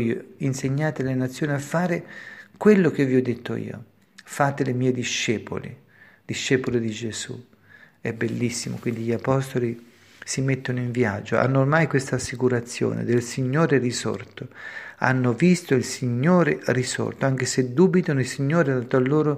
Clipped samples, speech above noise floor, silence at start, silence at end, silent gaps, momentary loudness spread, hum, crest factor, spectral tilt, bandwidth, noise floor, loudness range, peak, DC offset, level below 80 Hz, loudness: under 0.1%; 29 dB; 0 s; 0 s; none; 14 LU; none; 22 dB; -6 dB/octave; 15 kHz; -52 dBFS; 6 LU; -2 dBFS; under 0.1%; -60 dBFS; -23 LUFS